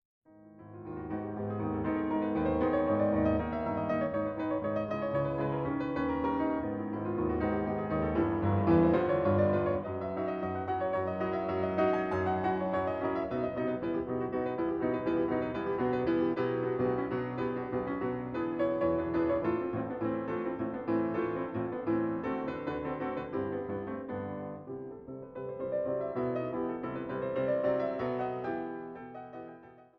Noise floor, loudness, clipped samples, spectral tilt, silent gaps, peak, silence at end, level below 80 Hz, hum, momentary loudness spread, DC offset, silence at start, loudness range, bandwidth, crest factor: -53 dBFS; -32 LUFS; under 0.1%; -10 dB/octave; none; -14 dBFS; 0.15 s; -54 dBFS; none; 9 LU; under 0.1%; 0.35 s; 6 LU; 5.6 kHz; 18 dB